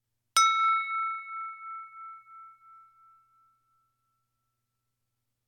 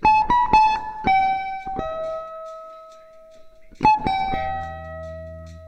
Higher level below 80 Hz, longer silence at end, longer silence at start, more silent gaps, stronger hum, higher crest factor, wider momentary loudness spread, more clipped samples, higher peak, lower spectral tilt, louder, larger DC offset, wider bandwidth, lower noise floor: second, -78 dBFS vs -42 dBFS; first, 2.95 s vs 0 s; first, 0.35 s vs 0 s; neither; neither; about the same, 22 dB vs 20 dB; first, 23 LU vs 20 LU; neither; second, -12 dBFS vs -2 dBFS; second, 4.5 dB/octave vs -5.5 dB/octave; second, -27 LUFS vs -21 LUFS; neither; first, 18 kHz vs 8.2 kHz; first, -82 dBFS vs -45 dBFS